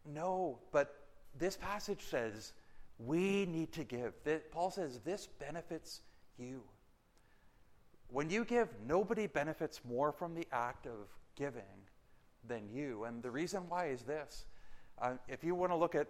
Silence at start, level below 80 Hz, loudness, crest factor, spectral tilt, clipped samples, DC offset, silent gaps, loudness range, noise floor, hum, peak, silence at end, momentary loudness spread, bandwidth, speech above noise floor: 0 s; -64 dBFS; -40 LUFS; 22 dB; -5.5 dB/octave; under 0.1%; under 0.1%; none; 7 LU; -68 dBFS; none; -20 dBFS; 0 s; 15 LU; 16 kHz; 29 dB